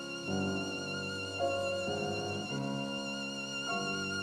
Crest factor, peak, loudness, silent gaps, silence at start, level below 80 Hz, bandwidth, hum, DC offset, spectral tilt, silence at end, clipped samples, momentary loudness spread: 16 dB; -20 dBFS; -35 LUFS; none; 0 s; -70 dBFS; 14.5 kHz; none; under 0.1%; -4 dB/octave; 0 s; under 0.1%; 3 LU